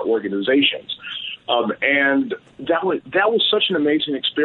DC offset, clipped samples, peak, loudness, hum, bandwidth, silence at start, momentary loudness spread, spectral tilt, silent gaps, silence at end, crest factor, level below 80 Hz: under 0.1%; under 0.1%; -4 dBFS; -19 LUFS; none; 4.3 kHz; 0 s; 12 LU; -7 dB/octave; none; 0 s; 16 dB; -66 dBFS